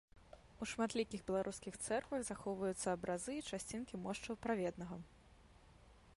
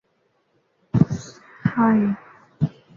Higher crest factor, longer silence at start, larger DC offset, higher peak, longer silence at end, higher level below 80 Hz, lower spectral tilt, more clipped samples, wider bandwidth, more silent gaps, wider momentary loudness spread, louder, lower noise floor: about the same, 18 dB vs 20 dB; second, 0.15 s vs 0.95 s; neither; second, -26 dBFS vs -2 dBFS; second, 0.05 s vs 0.3 s; second, -66 dBFS vs -50 dBFS; second, -4.5 dB/octave vs -8.5 dB/octave; neither; first, 11.5 kHz vs 7.4 kHz; neither; second, 10 LU vs 14 LU; second, -43 LUFS vs -22 LUFS; about the same, -65 dBFS vs -67 dBFS